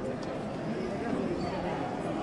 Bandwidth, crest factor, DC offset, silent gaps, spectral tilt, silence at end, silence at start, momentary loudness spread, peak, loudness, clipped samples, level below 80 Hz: 11.5 kHz; 14 dB; under 0.1%; none; -7 dB/octave; 0 s; 0 s; 4 LU; -20 dBFS; -34 LUFS; under 0.1%; -54 dBFS